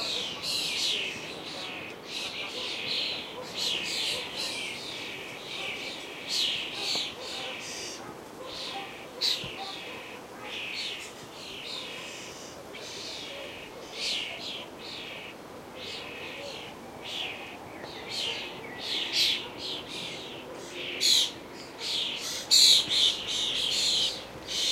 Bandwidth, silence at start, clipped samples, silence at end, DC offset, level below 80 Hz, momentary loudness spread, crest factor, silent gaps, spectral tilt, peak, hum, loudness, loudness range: 16 kHz; 0 s; under 0.1%; 0 s; under 0.1%; -66 dBFS; 17 LU; 24 dB; none; -0.5 dB/octave; -8 dBFS; none; -29 LUFS; 14 LU